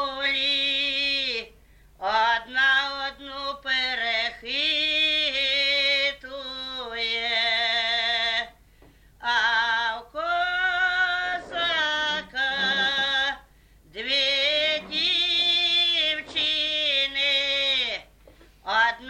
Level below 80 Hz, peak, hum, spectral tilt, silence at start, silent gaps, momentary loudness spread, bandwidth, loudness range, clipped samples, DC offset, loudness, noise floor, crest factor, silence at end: -56 dBFS; -10 dBFS; none; -1 dB/octave; 0 s; none; 11 LU; 12.5 kHz; 3 LU; under 0.1%; under 0.1%; -23 LUFS; -55 dBFS; 16 dB; 0 s